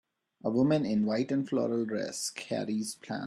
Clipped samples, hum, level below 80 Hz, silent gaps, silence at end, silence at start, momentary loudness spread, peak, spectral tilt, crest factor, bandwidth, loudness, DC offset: under 0.1%; none; -72 dBFS; none; 0 s; 0.45 s; 8 LU; -16 dBFS; -5.5 dB/octave; 16 dB; 13 kHz; -31 LUFS; under 0.1%